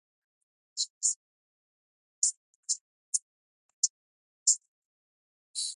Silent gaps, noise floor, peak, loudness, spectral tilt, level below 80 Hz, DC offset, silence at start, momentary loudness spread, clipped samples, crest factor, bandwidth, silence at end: 0.90-1.01 s, 1.16-2.22 s, 2.37-2.63 s, 2.81-3.12 s, 3.22-3.83 s, 3.90-4.46 s, 4.68-5.54 s; under -90 dBFS; -10 dBFS; -30 LUFS; 11 dB/octave; under -90 dBFS; under 0.1%; 0.75 s; 13 LU; under 0.1%; 26 dB; 11.5 kHz; 0 s